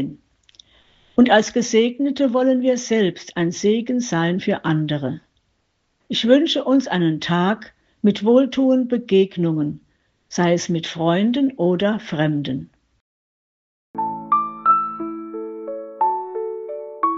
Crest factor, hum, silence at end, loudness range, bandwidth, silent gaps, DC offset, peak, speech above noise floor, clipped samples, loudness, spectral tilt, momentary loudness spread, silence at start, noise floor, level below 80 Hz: 18 dB; none; 0 s; 5 LU; 7.8 kHz; 13.01-13.94 s; under 0.1%; -2 dBFS; 50 dB; under 0.1%; -20 LUFS; -5.5 dB/octave; 13 LU; 0 s; -68 dBFS; -62 dBFS